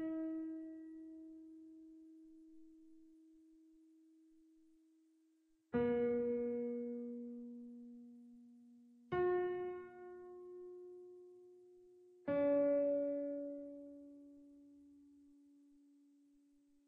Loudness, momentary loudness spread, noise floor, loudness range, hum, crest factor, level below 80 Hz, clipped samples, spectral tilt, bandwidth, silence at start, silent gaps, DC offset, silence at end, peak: -40 LUFS; 26 LU; -76 dBFS; 18 LU; none; 16 dB; -76 dBFS; under 0.1%; -9 dB/octave; 4.3 kHz; 0 s; none; under 0.1%; 1.55 s; -28 dBFS